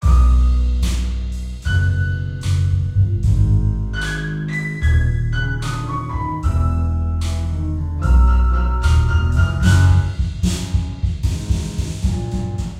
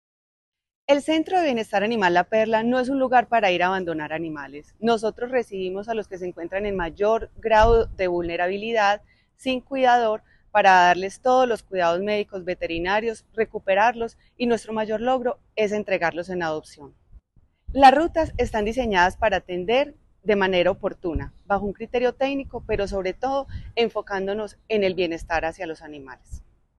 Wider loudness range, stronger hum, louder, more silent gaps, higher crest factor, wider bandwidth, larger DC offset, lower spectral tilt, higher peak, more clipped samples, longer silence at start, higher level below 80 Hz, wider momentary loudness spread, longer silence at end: about the same, 4 LU vs 6 LU; neither; first, -19 LUFS vs -23 LUFS; neither; about the same, 14 dB vs 18 dB; about the same, 11.5 kHz vs 12 kHz; neither; about the same, -6 dB/octave vs -5 dB/octave; about the same, -2 dBFS vs -4 dBFS; neither; second, 0 s vs 0.9 s; first, -20 dBFS vs -42 dBFS; about the same, 9 LU vs 11 LU; second, 0 s vs 0.4 s